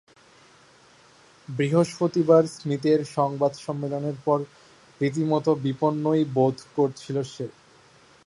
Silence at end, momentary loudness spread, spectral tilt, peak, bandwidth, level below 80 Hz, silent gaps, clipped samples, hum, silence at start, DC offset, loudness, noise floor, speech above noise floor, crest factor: 0.8 s; 11 LU; -7 dB/octave; -6 dBFS; 11.5 kHz; -68 dBFS; none; under 0.1%; none; 1.5 s; under 0.1%; -24 LUFS; -55 dBFS; 31 dB; 20 dB